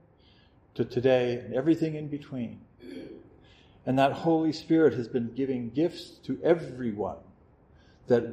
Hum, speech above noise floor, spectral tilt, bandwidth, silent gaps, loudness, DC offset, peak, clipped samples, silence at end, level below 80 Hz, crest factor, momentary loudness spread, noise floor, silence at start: none; 32 dB; -7.5 dB/octave; 9.4 kHz; none; -28 LUFS; under 0.1%; -10 dBFS; under 0.1%; 0 s; -64 dBFS; 20 dB; 19 LU; -59 dBFS; 0.75 s